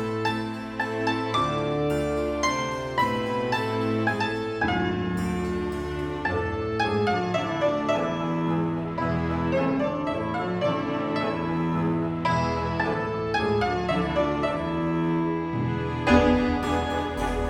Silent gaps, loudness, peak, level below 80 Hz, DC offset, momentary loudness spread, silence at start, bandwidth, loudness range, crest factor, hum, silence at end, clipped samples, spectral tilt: none; -26 LUFS; -4 dBFS; -42 dBFS; under 0.1%; 4 LU; 0 s; 15 kHz; 2 LU; 20 dB; none; 0 s; under 0.1%; -6.5 dB/octave